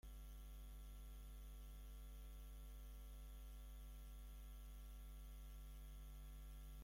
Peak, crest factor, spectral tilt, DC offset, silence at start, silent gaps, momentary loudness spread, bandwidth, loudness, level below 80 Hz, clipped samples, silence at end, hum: -48 dBFS; 8 dB; -5 dB/octave; under 0.1%; 0.05 s; none; 0 LU; 16.5 kHz; -60 LUFS; -56 dBFS; under 0.1%; 0 s; none